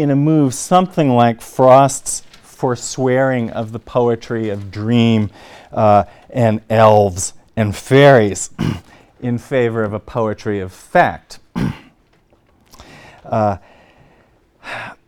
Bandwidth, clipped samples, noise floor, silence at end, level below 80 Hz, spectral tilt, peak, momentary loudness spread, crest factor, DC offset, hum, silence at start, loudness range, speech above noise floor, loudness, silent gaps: 16.5 kHz; 0.2%; -54 dBFS; 0.15 s; -46 dBFS; -6 dB/octave; 0 dBFS; 15 LU; 16 dB; under 0.1%; none; 0 s; 8 LU; 40 dB; -15 LUFS; none